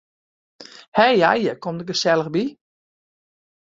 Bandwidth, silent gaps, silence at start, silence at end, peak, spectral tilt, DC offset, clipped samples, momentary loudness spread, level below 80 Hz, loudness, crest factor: 7.8 kHz; 0.88-0.92 s; 0.6 s; 1.25 s; -2 dBFS; -4.5 dB/octave; under 0.1%; under 0.1%; 11 LU; -64 dBFS; -19 LUFS; 20 dB